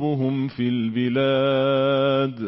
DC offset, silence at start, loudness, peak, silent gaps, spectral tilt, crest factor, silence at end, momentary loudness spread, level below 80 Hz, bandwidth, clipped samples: 0.1%; 0 s; -21 LUFS; -12 dBFS; none; -11.5 dB/octave; 10 dB; 0 s; 4 LU; -64 dBFS; 5.8 kHz; under 0.1%